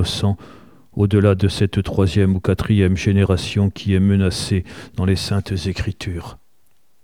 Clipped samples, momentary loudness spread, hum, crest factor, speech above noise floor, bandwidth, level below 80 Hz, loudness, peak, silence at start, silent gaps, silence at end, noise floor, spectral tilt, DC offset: under 0.1%; 12 LU; none; 16 dB; 47 dB; 12.5 kHz; -38 dBFS; -19 LUFS; -2 dBFS; 0 s; none; 0.7 s; -65 dBFS; -6.5 dB/octave; 0.4%